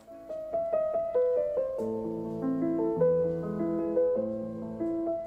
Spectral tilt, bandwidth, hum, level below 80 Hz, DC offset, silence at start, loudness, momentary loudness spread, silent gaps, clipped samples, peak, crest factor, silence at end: -10 dB/octave; 4 kHz; none; -60 dBFS; under 0.1%; 0.05 s; -30 LUFS; 8 LU; none; under 0.1%; -14 dBFS; 14 dB; 0 s